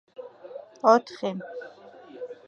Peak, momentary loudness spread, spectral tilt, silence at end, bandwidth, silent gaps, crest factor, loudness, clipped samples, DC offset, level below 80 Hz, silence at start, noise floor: -4 dBFS; 24 LU; -5.5 dB/octave; 0.15 s; 7.4 kHz; none; 24 dB; -24 LUFS; under 0.1%; under 0.1%; -84 dBFS; 0.2 s; -47 dBFS